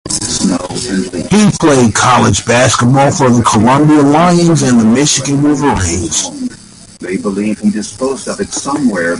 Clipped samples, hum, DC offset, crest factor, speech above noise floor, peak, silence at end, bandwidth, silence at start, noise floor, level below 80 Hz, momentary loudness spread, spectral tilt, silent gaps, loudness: under 0.1%; none; under 0.1%; 10 dB; 25 dB; 0 dBFS; 0 s; 11.5 kHz; 0.05 s; -35 dBFS; -34 dBFS; 10 LU; -4.5 dB/octave; none; -10 LUFS